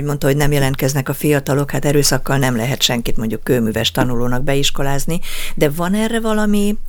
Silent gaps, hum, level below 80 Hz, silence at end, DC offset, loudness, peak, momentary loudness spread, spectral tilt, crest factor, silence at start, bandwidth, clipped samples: none; none; -24 dBFS; 0 s; under 0.1%; -17 LUFS; 0 dBFS; 5 LU; -4.5 dB/octave; 16 dB; 0 s; 19 kHz; under 0.1%